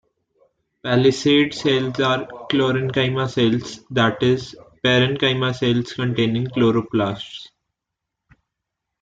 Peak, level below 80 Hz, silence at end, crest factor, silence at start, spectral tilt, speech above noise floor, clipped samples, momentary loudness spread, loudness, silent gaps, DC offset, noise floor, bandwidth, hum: -4 dBFS; -56 dBFS; 1.6 s; 16 dB; 0.85 s; -6 dB/octave; 63 dB; under 0.1%; 8 LU; -19 LUFS; none; under 0.1%; -82 dBFS; 7.8 kHz; none